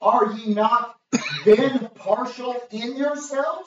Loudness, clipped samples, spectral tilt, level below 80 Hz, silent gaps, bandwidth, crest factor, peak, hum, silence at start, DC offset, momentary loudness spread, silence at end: -22 LUFS; under 0.1%; -4.5 dB/octave; -70 dBFS; none; 7.8 kHz; 16 dB; -4 dBFS; none; 0 s; under 0.1%; 12 LU; 0.05 s